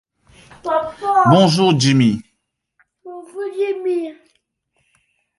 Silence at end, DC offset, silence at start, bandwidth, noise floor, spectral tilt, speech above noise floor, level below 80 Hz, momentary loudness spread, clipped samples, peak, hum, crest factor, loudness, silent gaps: 1.25 s; under 0.1%; 0.65 s; 11.5 kHz; -72 dBFS; -6 dB/octave; 58 dB; -58 dBFS; 20 LU; under 0.1%; 0 dBFS; none; 18 dB; -16 LUFS; none